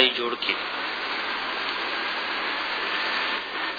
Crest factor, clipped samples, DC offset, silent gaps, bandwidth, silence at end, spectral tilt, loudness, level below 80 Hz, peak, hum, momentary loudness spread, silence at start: 24 dB; under 0.1%; under 0.1%; none; 5 kHz; 0 s; -2.5 dB/octave; -26 LUFS; -68 dBFS; -4 dBFS; none; 3 LU; 0 s